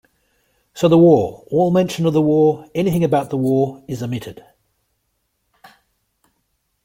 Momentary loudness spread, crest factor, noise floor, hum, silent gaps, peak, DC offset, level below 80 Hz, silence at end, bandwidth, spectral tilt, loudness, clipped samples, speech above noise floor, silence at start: 14 LU; 18 dB; -70 dBFS; none; none; -2 dBFS; under 0.1%; -56 dBFS; 2.5 s; 16.5 kHz; -7.5 dB/octave; -17 LUFS; under 0.1%; 54 dB; 0.75 s